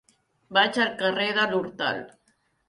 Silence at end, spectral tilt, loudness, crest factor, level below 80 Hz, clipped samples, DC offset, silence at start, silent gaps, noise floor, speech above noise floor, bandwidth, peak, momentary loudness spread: 0.6 s; -4 dB/octave; -24 LUFS; 18 dB; -70 dBFS; under 0.1%; under 0.1%; 0.5 s; none; -69 dBFS; 44 dB; 11.5 kHz; -8 dBFS; 7 LU